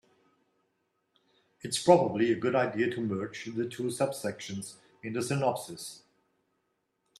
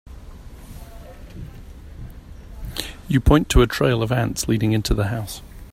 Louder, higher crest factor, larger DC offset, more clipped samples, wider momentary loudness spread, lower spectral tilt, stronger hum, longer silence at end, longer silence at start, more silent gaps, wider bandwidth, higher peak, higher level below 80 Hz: second, -30 LUFS vs -20 LUFS; about the same, 26 dB vs 22 dB; neither; neither; second, 18 LU vs 25 LU; about the same, -5 dB/octave vs -5.5 dB/octave; neither; first, 1.2 s vs 0.05 s; first, 1.65 s vs 0.05 s; neither; second, 13.5 kHz vs 16 kHz; second, -6 dBFS vs 0 dBFS; second, -72 dBFS vs -30 dBFS